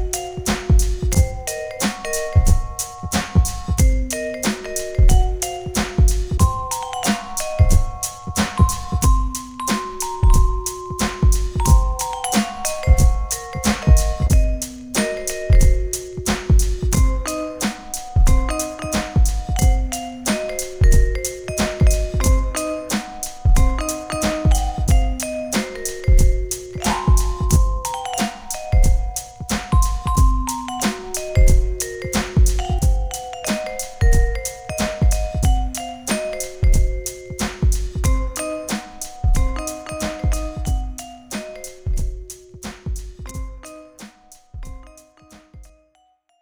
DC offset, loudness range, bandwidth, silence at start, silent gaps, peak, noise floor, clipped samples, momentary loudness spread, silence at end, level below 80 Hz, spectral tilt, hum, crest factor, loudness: under 0.1%; 6 LU; over 20 kHz; 0 s; none; -2 dBFS; -60 dBFS; under 0.1%; 10 LU; 0.8 s; -20 dBFS; -5 dB/octave; none; 16 dB; -21 LUFS